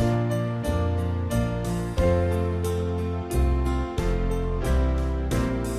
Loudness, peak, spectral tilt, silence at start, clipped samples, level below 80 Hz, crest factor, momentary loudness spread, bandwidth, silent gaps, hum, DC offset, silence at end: -26 LUFS; -12 dBFS; -7 dB/octave; 0 s; under 0.1%; -28 dBFS; 12 dB; 4 LU; 14 kHz; none; none; 0.1%; 0 s